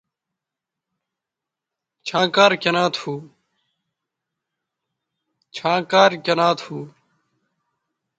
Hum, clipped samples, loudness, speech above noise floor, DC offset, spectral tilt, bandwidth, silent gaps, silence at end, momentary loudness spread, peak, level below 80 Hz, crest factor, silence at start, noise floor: none; under 0.1%; -18 LUFS; 67 dB; under 0.1%; -4 dB/octave; 9.2 kHz; none; 1.3 s; 18 LU; 0 dBFS; -70 dBFS; 24 dB; 2.05 s; -86 dBFS